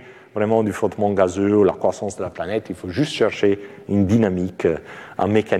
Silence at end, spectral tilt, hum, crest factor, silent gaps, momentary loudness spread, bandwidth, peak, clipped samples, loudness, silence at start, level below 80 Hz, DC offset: 0 s; -6.5 dB/octave; none; 16 dB; none; 11 LU; 12.5 kHz; -4 dBFS; under 0.1%; -20 LUFS; 0 s; -54 dBFS; under 0.1%